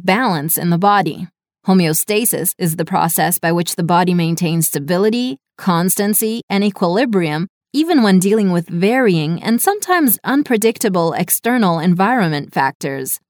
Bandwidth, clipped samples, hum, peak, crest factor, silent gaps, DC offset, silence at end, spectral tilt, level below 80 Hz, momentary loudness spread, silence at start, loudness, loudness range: over 20 kHz; under 0.1%; none; 0 dBFS; 14 dB; 6.43-6.48 s, 7.49-7.61 s, 12.75-12.80 s; under 0.1%; 0.1 s; -5 dB/octave; -64 dBFS; 6 LU; 0 s; -15 LUFS; 2 LU